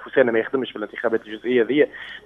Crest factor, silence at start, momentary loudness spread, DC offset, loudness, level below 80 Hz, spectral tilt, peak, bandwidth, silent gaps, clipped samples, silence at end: 20 dB; 0 s; 7 LU; under 0.1%; -22 LUFS; -64 dBFS; -7 dB/octave; -2 dBFS; 4 kHz; none; under 0.1%; 0.05 s